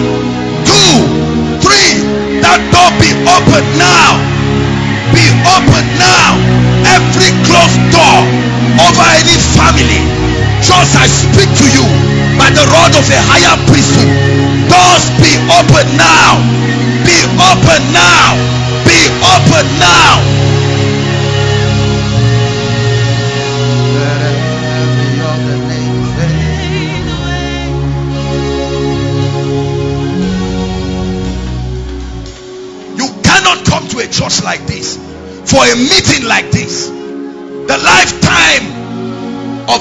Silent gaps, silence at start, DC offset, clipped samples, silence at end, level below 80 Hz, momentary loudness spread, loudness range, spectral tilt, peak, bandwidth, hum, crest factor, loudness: none; 0 s; under 0.1%; 3%; 0 s; -24 dBFS; 12 LU; 9 LU; -4 dB/octave; 0 dBFS; 11 kHz; none; 8 dB; -7 LUFS